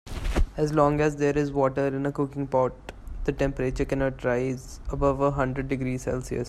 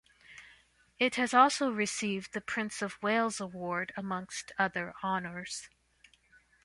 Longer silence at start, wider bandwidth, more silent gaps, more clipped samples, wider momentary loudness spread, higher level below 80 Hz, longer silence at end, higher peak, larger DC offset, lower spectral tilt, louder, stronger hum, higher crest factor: second, 0.05 s vs 0.3 s; first, 13 kHz vs 11.5 kHz; neither; neither; second, 9 LU vs 14 LU; first, -36 dBFS vs -70 dBFS; second, 0 s vs 0.95 s; about the same, -8 dBFS vs -10 dBFS; neither; first, -7 dB/octave vs -3.5 dB/octave; first, -26 LUFS vs -32 LUFS; neither; second, 18 dB vs 24 dB